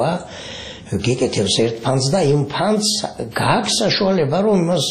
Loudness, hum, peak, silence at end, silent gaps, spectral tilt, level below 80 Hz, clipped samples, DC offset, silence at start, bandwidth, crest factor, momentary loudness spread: -18 LUFS; none; -2 dBFS; 0 s; none; -4.5 dB/octave; -48 dBFS; under 0.1%; under 0.1%; 0 s; 13 kHz; 16 dB; 10 LU